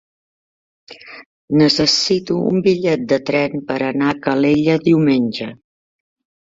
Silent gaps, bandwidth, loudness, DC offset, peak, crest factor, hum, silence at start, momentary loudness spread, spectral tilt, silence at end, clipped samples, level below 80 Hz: 1.26-1.48 s; 7.8 kHz; -16 LUFS; under 0.1%; -2 dBFS; 16 dB; none; 0.9 s; 8 LU; -5 dB/octave; 0.9 s; under 0.1%; -54 dBFS